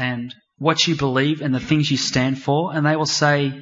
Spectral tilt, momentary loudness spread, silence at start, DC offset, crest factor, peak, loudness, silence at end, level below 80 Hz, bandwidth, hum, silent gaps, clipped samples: -4.5 dB/octave; 6 LU; 0 s; under 0.1%; 16 dB; -2 dBFS; -19 LUFS; 0 s; -52 dBFS; 8 kHz; none; none; under 0.1%